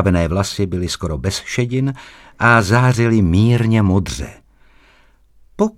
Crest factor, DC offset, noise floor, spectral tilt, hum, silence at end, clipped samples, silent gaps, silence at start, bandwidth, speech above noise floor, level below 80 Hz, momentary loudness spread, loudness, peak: 16 dB; under 0.1%; -51 dBFS; -6 dB/octave; none; 0.05 s; under 0.1%; none; 0 s; 14 kHz; 35 dB; -36 dBFS; 10 LU; -16 LUFS; 0 dBFS